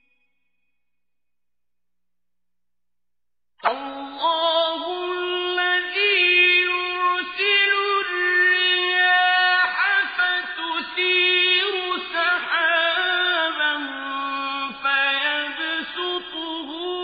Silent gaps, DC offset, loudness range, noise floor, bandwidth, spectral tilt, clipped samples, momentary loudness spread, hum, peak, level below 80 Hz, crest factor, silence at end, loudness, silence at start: none; under 0.1%; 8 LU; -89 dBFS; 5 kHz; -3.5 dB/octave; under 0.1%; 11 LU; 60 Hz at -80 dBFS; -6 dBFS; -68 dBFS; 18 dB; 0 s; -20 LUFS; 3.65 s